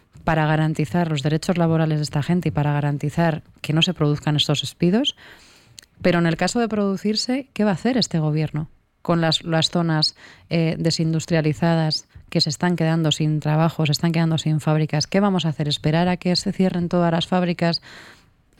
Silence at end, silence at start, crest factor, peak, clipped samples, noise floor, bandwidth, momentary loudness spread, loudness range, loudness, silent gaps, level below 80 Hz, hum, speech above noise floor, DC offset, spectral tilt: 0.5 s; 0.15 s; 14 dB; -6 dBFS; under 0.1%; -48 dBFS; 13 kHz; 4 LU; 1 LU; -21 LUFS; none; -50 dBFS; none; 28 dB; under 0.1%; -5.5 dB/octave